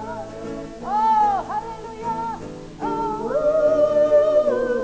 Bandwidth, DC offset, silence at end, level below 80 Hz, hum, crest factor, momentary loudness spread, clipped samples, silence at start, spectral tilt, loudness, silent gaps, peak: 8 kHz; under 0.1%; 0 s; -48 dBFS; none; 14 dB; 16 LU; under 0.1%; 0 s; -6 dB/octave; -20 LUFS; none; -8 dBFS